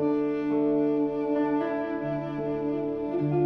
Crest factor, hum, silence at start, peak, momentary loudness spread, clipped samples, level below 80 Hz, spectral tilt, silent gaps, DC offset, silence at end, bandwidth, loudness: 12 dB; none; 0 s; -16 dBFS; 6 LU; under 0.1%; -58 dBFS; -10 dB/octave; none; under 0.1%; 0 s; 5 kHz; -28 LUFS